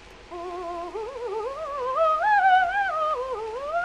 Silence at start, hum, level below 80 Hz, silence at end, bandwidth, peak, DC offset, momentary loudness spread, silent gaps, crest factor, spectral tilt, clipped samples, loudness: 0 s; none; -54 dBFS; 0 s; 10.5 kHz; -10 dBFS; under 0.1%; 15 LU; none; 16 dB; -3.5 dB/octave; under 0.1%; -25 LUFS